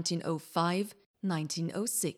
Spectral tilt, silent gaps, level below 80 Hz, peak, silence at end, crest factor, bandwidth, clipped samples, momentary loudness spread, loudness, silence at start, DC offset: -4.5 dB/octave; 1.06-1.14 s; -78 dBFS; -16 dBFS; 0.05 s; 18 dB; 16.5 kHz; under 0.1%; 6 LU; -33 LUFS; 0 s; under 0.1%